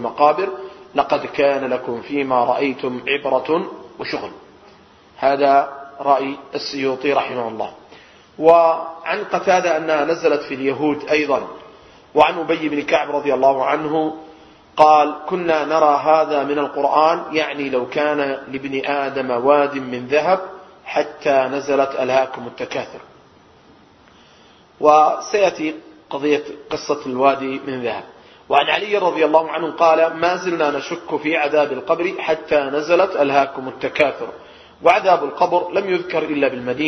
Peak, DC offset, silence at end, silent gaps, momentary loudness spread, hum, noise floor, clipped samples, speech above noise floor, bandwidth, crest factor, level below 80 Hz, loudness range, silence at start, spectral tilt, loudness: 0 dBFS; under 0.1%; 0 s; none; 11 LU; none; -49 dBFS; under 0.1%; 31 dB; 6.4 kHz; 18 dB; -60 dBFS; 4 LU; 0 s; -5 dB/octave; -18 LUFS